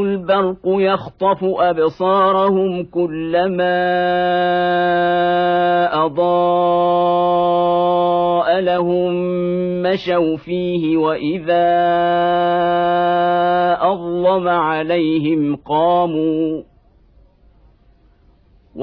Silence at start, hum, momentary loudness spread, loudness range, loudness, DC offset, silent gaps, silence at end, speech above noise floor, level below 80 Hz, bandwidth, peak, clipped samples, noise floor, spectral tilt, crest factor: 0 s; none; 4 LU; 3 LU; -16 LUFS; under 0.1%; none; 0 s; 36 dB; -52 dBFS; 5.4 kHz; -4 dBFS; under 0.1%; -52 dBFS; -9 dB/octave; 12 dB